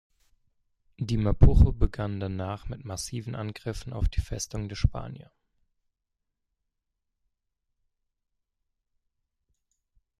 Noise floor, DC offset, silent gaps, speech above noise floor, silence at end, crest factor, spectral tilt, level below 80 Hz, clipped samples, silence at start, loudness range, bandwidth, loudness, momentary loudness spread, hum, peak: -83 dBFS; under 0.1%; none; 58 dB; 5 s; 22 dB; -6.5 dB/octave; -32 dBFS; under 0.1%; 1 s; 9 LU; 13 kHz; -28 LUFS; 16 LU; none; -8 dBFS